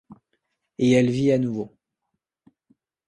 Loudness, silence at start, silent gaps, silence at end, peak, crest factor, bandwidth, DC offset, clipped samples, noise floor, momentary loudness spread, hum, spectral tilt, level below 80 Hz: -21 LUFS; 0.1 s; none; 1.4 s; -8 dBFS; 18 dB; 10.5 kHz; under 0.1%; under 0.1%; -81 dBFS; 18 LU; none; -7 dB/octave; -60 dBFS